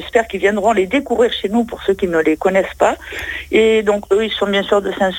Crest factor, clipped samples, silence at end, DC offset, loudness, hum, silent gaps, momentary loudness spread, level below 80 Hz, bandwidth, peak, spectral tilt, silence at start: 14 dB; under 0.1%; 0 s; under 0.1%; -16 LUFS; none; none; 5 LU; -42 dBFS; 17 kHz; -2 dBFS; -4.5 dB/octave; 0 s